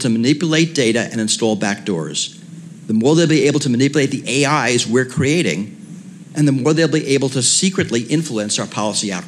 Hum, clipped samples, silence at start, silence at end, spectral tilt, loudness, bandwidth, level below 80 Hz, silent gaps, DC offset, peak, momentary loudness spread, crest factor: none; under 0.1%; 0 s; 0 s; -4 dB/octave; -16 LUFS; 13 kHz; -64 dBFS; none; under 0.1%; -4 dBFS; 11 LU; 14 dB